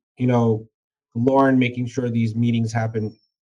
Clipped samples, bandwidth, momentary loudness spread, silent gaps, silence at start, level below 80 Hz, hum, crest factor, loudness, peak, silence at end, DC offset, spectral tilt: under 0.1%; 7.6 kHz; 11 LU; 0.74-0.91 s; 0.2 s; -62 dBFS; none; 16 dB; -21 LUFS; -6 dBFS; 0.3 s; under 0.1%; -8 dB/octave